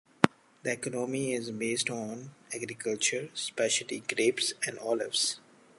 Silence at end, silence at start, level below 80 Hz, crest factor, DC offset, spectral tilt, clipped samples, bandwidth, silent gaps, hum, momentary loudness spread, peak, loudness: 0.4 s; 0.2 s; -70 dBFS; 32 dB; under 0.1%; -2.5 dB/octave; under 0.1%; 12 kHz; none; none; 10 LU; 0 dBFS; -31 LUFS